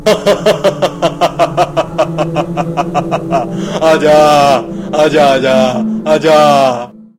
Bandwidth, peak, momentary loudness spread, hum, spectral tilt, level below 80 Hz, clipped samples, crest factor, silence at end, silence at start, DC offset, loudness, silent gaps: 16 kHz; 0 dBFS; 9 LU; none; -5 dB/octave; -40 dBFS; 0.2%; 10 dB; 0.15 s; 0 s; under 0.1%; -11 LUFS; none